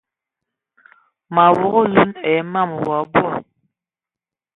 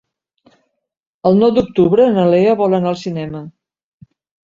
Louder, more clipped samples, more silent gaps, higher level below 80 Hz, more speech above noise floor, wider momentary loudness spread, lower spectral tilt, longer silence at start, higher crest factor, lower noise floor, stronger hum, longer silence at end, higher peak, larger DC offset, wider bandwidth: second, -17 LUFS vs -14 LUFS; neither; neither; about the same, -54 dBFS vs -50 dBFS; first, 74 dB vs 45 dB; second, 8 LU vs 13 LU; about the same, -8.5 dB/octave vs -8.5 dB/octave; about the same, 1.3 s vs 1.25 s; first, 20 dB vs 14 dB; first, -90 dBFS vs -59 dBFS; neither; first, 1.15 s vs 1 s; about the same, 0 dBFS vs -2 dBFS; neither; second, 4.1 kHz vs 7.6 kHz